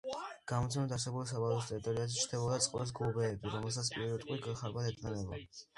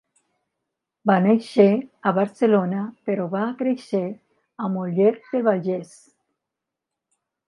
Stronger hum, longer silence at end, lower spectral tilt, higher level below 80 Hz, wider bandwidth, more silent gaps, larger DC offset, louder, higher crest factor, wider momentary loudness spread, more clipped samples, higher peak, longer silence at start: neither; second, 0.15 s vs 1.65 s; second, -4.5 dB/octave vs -8 dB/octave; first, -60 dBFS vs -76 dBFS; about the same, 11.5 kHz vs 11 kHz; neither; neither; second, -37 LUFS vs -22 LUFS; about the same, 18 dB vs 20 dB; second, 7 LU vs 10 LU; neither; second, -18 dBFS vs -2 dBFS; second, 0.05 s vs 1.05 s